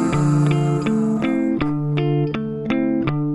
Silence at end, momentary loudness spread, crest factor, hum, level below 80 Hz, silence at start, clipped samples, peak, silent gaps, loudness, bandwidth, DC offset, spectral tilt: 0 s; 4 LU; 14 dB; none; -44 dBFS; 0 s; under 0.1%; -6 dBFS; none; -20 LUFS; 10.5 kHz; under 0.1%; -8 dB/octave